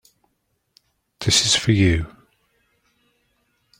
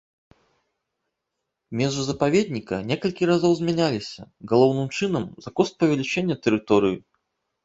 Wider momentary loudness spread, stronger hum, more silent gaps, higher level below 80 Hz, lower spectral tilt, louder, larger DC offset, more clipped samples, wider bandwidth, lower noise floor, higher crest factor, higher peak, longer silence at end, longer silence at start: about the same, 12 LU vs 10 LU; neither; neither; first, -42 dBFS vs -58 dBFS; second, -3.5 dB/octave vs -6 dB/octave; first, -18 LUFS vs -23 LUFS; neither; neither; first, 16.5 kHz vs 8 kHz; second, -71 dBFS vs -81 dBFS; about the same, 20 dB vs 20 dB; about the same, -4 dBFS vs -4 dBFS; first, 1.75 s vs 0.65 s; second, 1.2 s vs 1.7 s